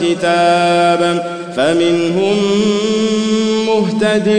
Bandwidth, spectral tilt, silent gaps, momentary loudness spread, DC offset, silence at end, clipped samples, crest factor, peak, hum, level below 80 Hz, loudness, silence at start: 9.8 kHz; -5 dB/octave; none; 4 LU; 0.4%; 0 s; under 0.1%; 10 dB; -2 dBFS; none; -56 dBFS; -13 LUFS; 0 s